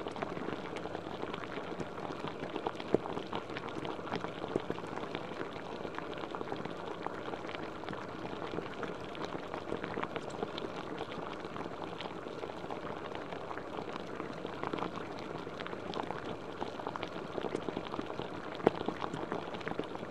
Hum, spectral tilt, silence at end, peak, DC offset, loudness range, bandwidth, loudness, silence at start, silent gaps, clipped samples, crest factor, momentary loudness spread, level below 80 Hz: none; -6 dB/octave; 0 s; -6 dBFS; 0.2%; 3 LU; 13 kHz; -40 LUFS; 0 s; none; under 0.1%; 34 dB; 4 LU; -64 dBFS